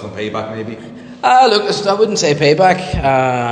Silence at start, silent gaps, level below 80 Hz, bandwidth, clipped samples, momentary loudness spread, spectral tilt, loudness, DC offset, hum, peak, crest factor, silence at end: 0 s; none; -36 dBFS; 10 kHz; under 0.1%; 16 LU; -4.5 dB/octave; -13 LUFS; under 0.1%; none; 0 dBFS; 14 dB; 0 s